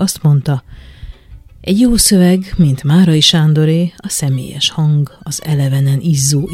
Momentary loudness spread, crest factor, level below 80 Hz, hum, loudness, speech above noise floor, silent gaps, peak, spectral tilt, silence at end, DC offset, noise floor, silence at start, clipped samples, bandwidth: 9 LU; 12 dB; -32 dBFS; none; -12 LUFS; 25 dB; none; 0 dBFS; -5 dB/octave; 0 s; under 0.1%; -37 dBFS; 0 s; under 0.1%; 16 kHz